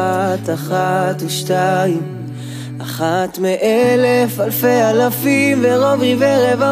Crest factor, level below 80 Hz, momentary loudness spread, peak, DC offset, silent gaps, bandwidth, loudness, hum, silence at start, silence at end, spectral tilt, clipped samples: 12 dB; -60 dBFS; 12 LU; -2 dBFS; under 0.1%; none; 15.5 kHz; -15 LUFS; none; 0 s; 0 s; -5.5 dB/octave; under 0.1%